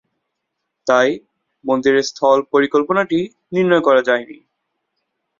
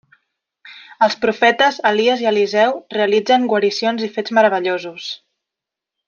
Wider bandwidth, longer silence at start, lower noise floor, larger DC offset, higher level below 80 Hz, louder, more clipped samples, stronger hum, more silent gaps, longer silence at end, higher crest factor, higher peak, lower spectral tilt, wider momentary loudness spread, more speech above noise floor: about the same, 7.6 kHz vs 7.2 kHz; first, 0.85 s vs 0.65 s; second, -76 dBFS vs -85 dBFS; neither; first, -62 dBFS vs -68 dBFS; about the same, -16 LUFS vs -16 LUFS; neither; neither; neither; first, 1.05 s vs 0.9 s; about the same, 16 dB vs 16 dB; about the same, -2 dBFS vs 0 dBFS; about the same, -5 dB/octave vs -4 dB/octave; about the same, 8 LU vs 9 LU; second, 61 dB vs 68 dB